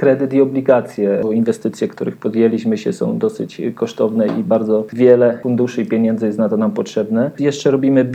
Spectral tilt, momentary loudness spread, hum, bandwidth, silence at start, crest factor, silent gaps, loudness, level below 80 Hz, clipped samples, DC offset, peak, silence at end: -7.5 dB/octave; 8 LU; none; 9.2 kHz; 0 s; 16 dB; none; -16 LUFS; -68 dBFS; under 0.1%; under 0.1%; 0 dBFS; 0 s